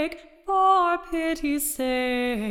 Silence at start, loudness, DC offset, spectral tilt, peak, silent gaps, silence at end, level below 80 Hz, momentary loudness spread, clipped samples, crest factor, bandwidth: 0 s; -24 LUFS; under 0.1%; -3 dB/octave; -10 dBFS; none; 0 s; -48 dBFS; 8 LU; under 0.1%; 14 dB; 18 kHz